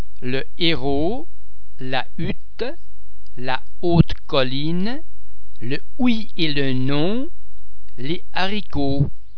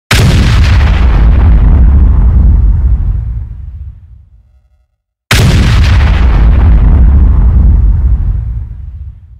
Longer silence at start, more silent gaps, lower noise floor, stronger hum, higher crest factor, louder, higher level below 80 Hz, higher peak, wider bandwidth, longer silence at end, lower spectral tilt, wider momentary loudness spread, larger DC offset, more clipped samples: about the same, 0 s vs 0.1 s; neither; second, -47 dBFS vs -59 dBFS; neither; first, 24 dB vs 6 dB; second, -23 LUFS vs -8 LUFS; second, -38 dBFS vs -8 dBFS; about the same, 0 dBFS vs 0 dBFS; second, 5.4 kHz vs 13.5 kHz; second, 0 s vs 0.3 s; first, -8 dB/octave vs -6 dB/octave; second, 11 LU vs 18 LU; first, 20% vs 3%; second, under 0.1% vs 0.1%